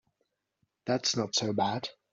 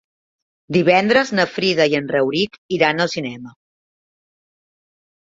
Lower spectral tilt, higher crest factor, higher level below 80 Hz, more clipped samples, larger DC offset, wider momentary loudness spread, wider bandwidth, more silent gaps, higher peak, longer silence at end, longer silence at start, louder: second, -3.5 dB/octave vs -5 dB/octave; about the same, 18 dB vs 18 dB; second, -74 dBFS vs -60 dBFS; neither; neither; about the same, 8 LU vs 8 LU; about the same, 7.8 kHz vs 7.8 kHz; second, none vs 2.58-2.69 s; second, -16 dBFS vs -2 dBFS; second, 0.2 s vs 1.75 s; first, 0.85 s vs 0.7 s; second, -30 LUFS vs -17 LUFS